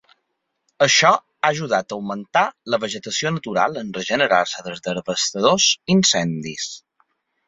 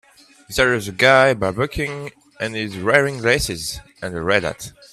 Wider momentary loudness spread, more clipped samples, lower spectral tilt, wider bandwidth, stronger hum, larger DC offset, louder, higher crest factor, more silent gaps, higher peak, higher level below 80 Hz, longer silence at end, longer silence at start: about the same, 13 LU vs 15 LU; neither; about the same, -3 dB/octave vs -4 dB/octave; second, 8 kHz vs 15 kHz; neither; neither; about the same, -19 LUFS vs -19 LUFS; about the same, 20 dB vs 20 dB; neither; about the same, -2 dBFS vs 0 dBFS; second, -62 dBFS vs -42 dBFS; first, 0.7 s vs 0.2 s; first, 0.8 s vs 0.5 s